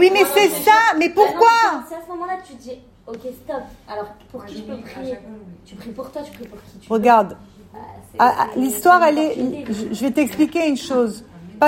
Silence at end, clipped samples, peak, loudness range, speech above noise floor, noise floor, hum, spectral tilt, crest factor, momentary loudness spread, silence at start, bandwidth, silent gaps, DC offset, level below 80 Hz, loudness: 0 s; under 0.1%; 0 dBFS; 15 LU; 21 dB; -39 dBFS; none; -3.5 dB/octave; 18 dB; 23 LU; 0 s; 16.5 kHz; none; under 0.1%; -54 dBFS; -16 LUFS